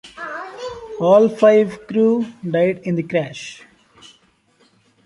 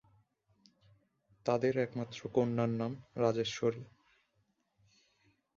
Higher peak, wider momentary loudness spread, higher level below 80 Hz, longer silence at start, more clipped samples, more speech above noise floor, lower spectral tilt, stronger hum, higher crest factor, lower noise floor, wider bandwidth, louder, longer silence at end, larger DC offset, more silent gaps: first, -2 dBFS vs -16 dBFS; first, 18 LU vs 8 LU; first, -60 dBFS vs -74 dBFS; second, 0.05 s vs 1.45 s; neither; about the same, 41 dB vs 44 dB; first, -7 dB/octave vs -5.5 dB/octave; neither; about the same, 18 dB vs 20 dB; second, -58 dBFS vs -78 dBFS; first, 11 kHz vs 7.6 kHz; first, -17 LUFS vs -34 LUFS; second, 1.5 s vs 1.7 s; neither; neither